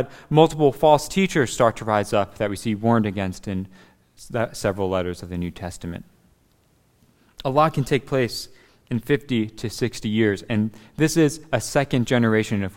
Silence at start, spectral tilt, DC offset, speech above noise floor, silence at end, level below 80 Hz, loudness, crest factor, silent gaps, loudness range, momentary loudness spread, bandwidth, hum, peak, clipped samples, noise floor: 0 s; -5.5 dB/octave; under 0.1%; 39 dB; 0.05 s; -48 dBFS; -22 LUFS; 22 dB; none; 8 LU; 13 LU; 16.5 kHz; none; 0 dBFS; under 0.1%; -61 dBFS